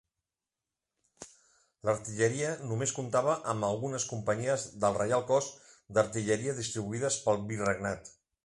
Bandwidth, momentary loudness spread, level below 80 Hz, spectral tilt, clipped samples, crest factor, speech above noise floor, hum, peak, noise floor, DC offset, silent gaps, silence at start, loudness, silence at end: 11.5 kHz; 8 LU; -64 dBFS; -4.5 dB/octave; under 0.1%; 20 dB; over 59 dB; none; -12 dBFS; under -90 dBFS; under 0.1%; none; 1.2 s; -31 LUFS; 0.35 s